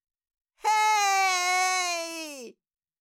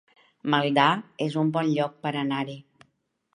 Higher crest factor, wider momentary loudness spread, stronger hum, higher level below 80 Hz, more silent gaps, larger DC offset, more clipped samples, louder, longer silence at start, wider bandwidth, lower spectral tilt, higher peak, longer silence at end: second, 12 dB vs 22 dB; first, 15 LU vs 12 LU; neither; second, -82 dBFS vs -76 dBFS; neither; neither; neither; about the same, -24 LUFS vs -25 LUFS; first, 0.65 s vs 0.45 s; first, 17 kHz vs 10.5 kHz; second, 2.5 dB/octave vs -6.5 dB/octave; second, -14 dBFS vs -4 dBFS; second, 0.5 s vs 0.75 s